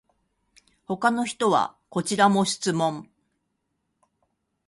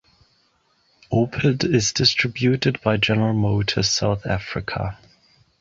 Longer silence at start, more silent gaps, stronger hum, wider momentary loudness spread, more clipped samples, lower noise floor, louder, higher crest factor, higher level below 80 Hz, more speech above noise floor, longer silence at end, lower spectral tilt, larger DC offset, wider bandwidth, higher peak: second, 0.9 s vs 1.1 s; neither; neither; about the same, 10 LU vs 9 LU; neither; first, -77 dBFS vs -63 dBFS; second, -24 LUFS vs -21 LUFS; about the same, 22 dB vs 18 dB; second, -68 dBFS vs -44 dBFS; first, 53 dB vs 43 dB; first, 1.65 s vs 0.65 s; about the same, -4.5 dB/octave vs -4.5 dB/octave; neither; first, 11.5 kHz vs 8 kHz; about the same, -6 dBFS vs -4 dBFS